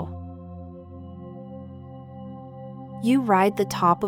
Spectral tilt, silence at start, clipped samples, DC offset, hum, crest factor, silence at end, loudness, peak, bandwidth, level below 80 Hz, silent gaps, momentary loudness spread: -6.5 dB/octave; 0 s; under 0.1%; under 0.1%; none; 18 dB; 0 s; -22 LUFS; -8 dBFS; 18.5 kHz; -56 dBFS; none; 21 LU